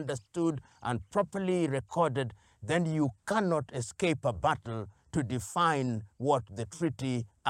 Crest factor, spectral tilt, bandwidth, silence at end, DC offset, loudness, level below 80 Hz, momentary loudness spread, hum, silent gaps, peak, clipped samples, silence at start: 18 dB; -6 dB/octave; 15.5 kHz; 0 s; under 0.1%; -32 LUFS; -60 dBFS; 8 LU; none; none; -14 dBFS; under 0.1%; 0 s